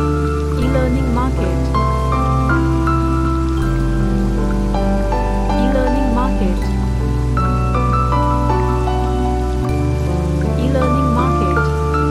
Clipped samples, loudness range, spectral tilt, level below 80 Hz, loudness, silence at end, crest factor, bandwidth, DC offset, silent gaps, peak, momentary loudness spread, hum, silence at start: under 0.1%; 1 LU; -7.5 dB/octave; -20 dBFS; -17 LUFS; 0 s; 12 dB; 12.5 kHz; 0.4%; none; -4 dBFS; 3 LU; none; 0 s